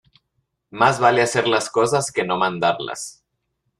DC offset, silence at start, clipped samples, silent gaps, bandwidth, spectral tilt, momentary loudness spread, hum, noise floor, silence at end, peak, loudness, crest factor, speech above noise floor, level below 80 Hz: under 0.1%; 0.75 s; under 0.1%; none; 13 kHz; -3.5 dB/octave; 14 LU; none; -74 dBFS; 0.7 s; -2 dBFS; -19 LUFS; 18 dB; 54 dB; -60 dBFS